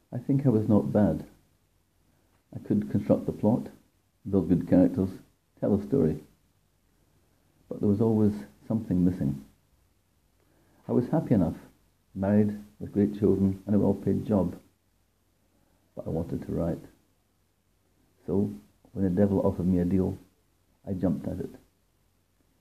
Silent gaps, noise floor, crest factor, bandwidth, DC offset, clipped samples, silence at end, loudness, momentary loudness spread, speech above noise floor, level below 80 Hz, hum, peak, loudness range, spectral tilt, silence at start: none; -71 dBFS; 20 dB; 14 kHz; under 0.1%; under 0.1%; 1.05 s; -27 LUFS; 18 LU; 45 dB; -58 dBFS; none; -8 dBFS; 6 LU; -10.5 dB/octave; 0.1 s